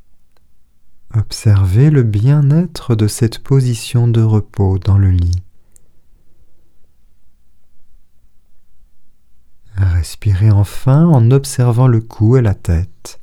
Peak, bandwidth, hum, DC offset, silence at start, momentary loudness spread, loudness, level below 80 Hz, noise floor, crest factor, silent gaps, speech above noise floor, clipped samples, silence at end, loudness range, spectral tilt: 0 dBFS; 13.5 kHz; none; under 0.1%; 0.1 s; 8 LU; -13 LUFS; -32 dBFS; -41 dBFS; 14 dB; none; 30 dB; under 0.1%; 0 s; 10 LU; -7.5 dB/octave